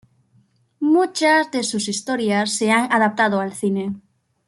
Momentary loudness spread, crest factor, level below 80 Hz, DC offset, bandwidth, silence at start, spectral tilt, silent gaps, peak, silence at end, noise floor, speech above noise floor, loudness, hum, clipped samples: 8 LU; 16 dB; -68 dBFS; under 0.1%; 12.5 kHz; 0.8 s; -4 dB/octave; none; -4 dBFS; 0.5 s; -59 dBFS; 40 dB; -19 LUFS; none; under 0.1%